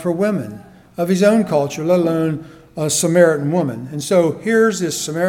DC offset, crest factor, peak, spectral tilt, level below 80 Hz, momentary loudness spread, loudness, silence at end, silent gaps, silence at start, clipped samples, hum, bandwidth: under 0.1%; 16 dB; 0 dBFS; -5 dB/octave; -56 dBFS; 12 LU; -17 LUFS; 0 s; none; 0 s; under 0.1%; none; 19 kHz